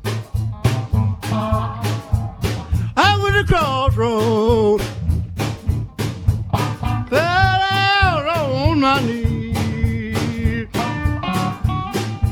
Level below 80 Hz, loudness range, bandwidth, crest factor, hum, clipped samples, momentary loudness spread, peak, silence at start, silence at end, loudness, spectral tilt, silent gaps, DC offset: -28 dBFS; 3 LU; 17 kHz; 18 dB; none; under 0.1%; 8 LU; 0 dBFS; 0 s; 0 s; -19 LUFS; -6 dB/octave; none; under 0.1%